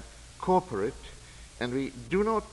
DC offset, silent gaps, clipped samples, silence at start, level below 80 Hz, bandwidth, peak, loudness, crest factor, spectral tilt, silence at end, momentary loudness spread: under 0.1%; none; under 0.1%; 0 s; -50 dBFS; 11.5 kHz; -12 dBFS; -30 LUFS; 18 dB; -6 dB/octave; 0 s; 21 LU